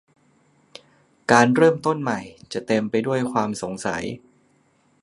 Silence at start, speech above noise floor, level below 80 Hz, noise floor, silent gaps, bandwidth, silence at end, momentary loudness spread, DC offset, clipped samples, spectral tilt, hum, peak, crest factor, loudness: 1.3 s; 41 dB; -62 dBFS; -62 dBFS; none; 11.5 kHz; 0.85 s; 16 LU; under 0.1%; under 0.1%; -5.5 dB/octave; none; 0 dBFS; 22 dB; -21 LUFS